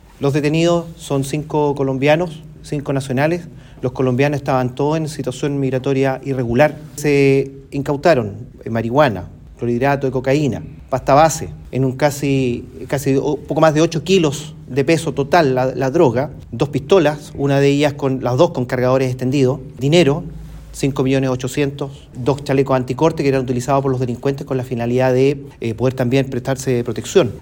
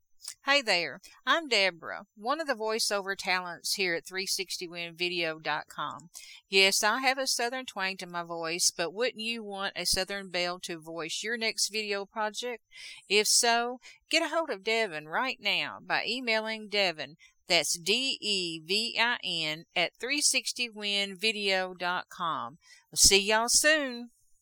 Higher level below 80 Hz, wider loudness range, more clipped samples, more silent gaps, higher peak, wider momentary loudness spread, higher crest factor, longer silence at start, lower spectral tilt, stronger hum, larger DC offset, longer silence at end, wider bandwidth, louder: first, -42 dBFS vs -58 dBFS; about the same, 3 LU vs 4 LU; neither; neither; first, 0 dBFS vs -6 dBFS; second, 10 LU vs 14 LU; second, 16 dB vs 24 dB; about the same, 0.2 s vs 0.25 s; first, -6.5 dB/octave vs -0.5 dB/octave; neither; neither; second, 0 s vs 0.35 s; second, 17 kHz vs 19.5 kHz; first, -17 LUFS vs -28 LUFS